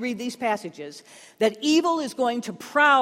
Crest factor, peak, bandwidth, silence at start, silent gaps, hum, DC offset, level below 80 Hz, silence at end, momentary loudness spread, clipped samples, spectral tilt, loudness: 18 dB; -6 dBFS; 16 kHz; 0 s; none; none; under 0.1%; -72 dBFS; 0 s; 18 LU; under 0.1%; -3 dB/octave; -24 LUFS